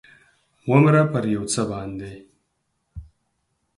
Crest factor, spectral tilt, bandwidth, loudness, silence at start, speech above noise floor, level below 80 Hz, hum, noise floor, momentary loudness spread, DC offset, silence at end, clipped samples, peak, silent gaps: 20 dB; -6.5 dB/octave; 11.5 kHz; -20 LUFS; 0.65 s; 53 dB; -50 dBFS; none; -73 dBFS; 19 LU; under 0.1%; 0.75 s; under 0.1%; -2 dBFS; none